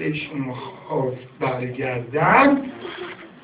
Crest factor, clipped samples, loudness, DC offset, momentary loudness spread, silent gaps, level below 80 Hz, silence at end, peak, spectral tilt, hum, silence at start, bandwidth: 20 dB; under 0.1%; -21 LUFS; under 0.1%; 18 LU; none; -56 dBFS; 0.05 s; -2 dBFS; -10 dB/octave; none; 0 s; 4 kHz